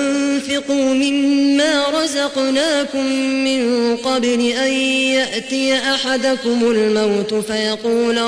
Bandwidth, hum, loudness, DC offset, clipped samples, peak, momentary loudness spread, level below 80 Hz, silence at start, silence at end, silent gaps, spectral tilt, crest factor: 11 kHz; none; -16 LUFS; under 0.1%; under 0.1%; -6 dBFS; 4 LU; -56 dBFS; 0 s; 0 s; none; -3 dB/octave; 10 dB